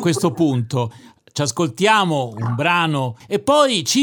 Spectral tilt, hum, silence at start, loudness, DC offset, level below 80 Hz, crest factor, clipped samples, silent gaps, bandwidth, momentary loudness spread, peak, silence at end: -4.5 dB/octave; none; 0 s; -18 LUFS; under 0.1%; -60 dBFS; 18 dB; under 0.1%; none; 19.5 kHz; 9 LU; 0 dBFS; 0 s